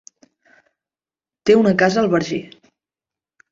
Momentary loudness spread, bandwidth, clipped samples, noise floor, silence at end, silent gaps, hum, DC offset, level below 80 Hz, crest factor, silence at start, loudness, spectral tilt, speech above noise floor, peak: 12 LU; 7.8 kHz; under 0.1%; under -90 dBFS; 1.1 s; none; none; under 0.1%; -58 dBFS; 18 dB; 1.45 s; -17 LUFS; -6 dB/octave; over 74 dB; -2 dBFS